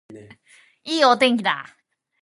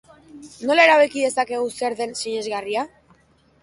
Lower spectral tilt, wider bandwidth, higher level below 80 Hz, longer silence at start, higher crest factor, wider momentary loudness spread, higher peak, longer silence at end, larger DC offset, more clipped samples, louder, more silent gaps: first, -3.5 dB/octave vs -2 dB/octave; about the same, 11.5 kHz vs 11.5 kHz; second, -70 dBFS vs -64 dBFS; second, 0.1 s vs 0.35 s; about the same, 20 dB vs 18 dB; about the same, 13 LU vs 13 LU; about the same, -4 dBFS vs -2 dBFS; second, 0.6 s vs 0.75 s; neither; neither; about the same, -19 LUFS vs -20 LUFS; neither